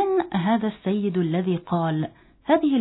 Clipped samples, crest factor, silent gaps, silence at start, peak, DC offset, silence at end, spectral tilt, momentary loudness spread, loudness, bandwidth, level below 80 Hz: under 0.1%; 14 dB; none; 0 s; -8 dBFS; under 0.1%; 0 s; -11.5 dB/octave; 6 LU; -24 LUFS; 4.1 kHz; -60 dBFS